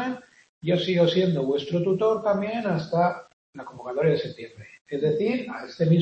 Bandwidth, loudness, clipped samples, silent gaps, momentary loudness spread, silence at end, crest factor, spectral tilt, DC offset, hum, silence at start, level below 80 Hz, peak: 8 kHz; -25 LUFS; under 0.1%; 0.49-0.61 s, 3.33-3.53 s, 4.81-4.85 s; 17 LU; 0 s; 16 dB; -7.5 dB/octave; under 0.1%; none; 0 s; -66 dBFS; -8 dBFS